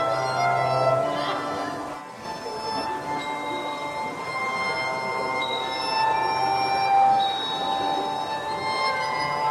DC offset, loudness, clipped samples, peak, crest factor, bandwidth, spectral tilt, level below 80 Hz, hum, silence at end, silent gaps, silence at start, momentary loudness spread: under 0.1%; -25 LUFS; under 0.1%; -10 dBFS; 16 dB; 14 kHz; -4 dB/octave; -62 dBFS; none; 0 s; none; 0 s; 9 LU